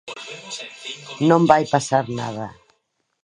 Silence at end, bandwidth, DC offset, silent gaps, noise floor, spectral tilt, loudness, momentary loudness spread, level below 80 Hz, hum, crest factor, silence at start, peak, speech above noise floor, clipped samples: 0.75 s; 11 kHz; under 0.1%; none; -71 dBFS; -5.5 dB/octave; -19 LUFS; 18 LU; -60 dBFS; none; 22 dB; 0.05 s; 0 dBFS; 52 dB; under 0.1%